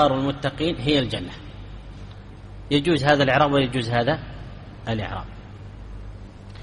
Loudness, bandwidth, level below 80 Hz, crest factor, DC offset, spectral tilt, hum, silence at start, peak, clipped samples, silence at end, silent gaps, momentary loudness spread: -22 LUFS; 11 kHz; -42 dBFS; 20 dB; under 0.1%; -6 dB/octave; 50 Hz at -40 dBFS; 0 s; -4 dBFS; under 0.1%; 0 s; none; 23 LU